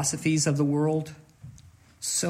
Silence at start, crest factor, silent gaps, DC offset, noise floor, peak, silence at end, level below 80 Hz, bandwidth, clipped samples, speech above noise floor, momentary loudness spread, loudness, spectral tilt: 0 s; 14 dB; none; under 0.1%; -53 dBFS; -12 dBFS; 0 s; -64 dBFS; 16 kHz; under 0.1%; 27 dB; 16 LU; -26 LUFS; -4.5 dB/octave